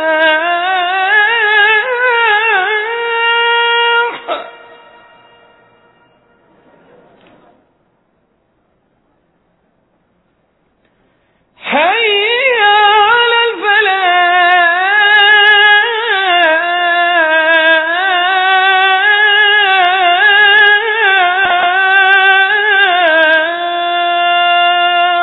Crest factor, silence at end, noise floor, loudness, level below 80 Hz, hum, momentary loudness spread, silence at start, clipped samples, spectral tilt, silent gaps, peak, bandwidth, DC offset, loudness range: 12 dB; 0 s; -58 dBFS; -9 LUFS; -60 dBFS; none; 7 LU; 0 s; under 0.1%; -3.5 dB/octave; none; 0 dBFS; 5.4 kHz; under 0.1%; 8 LU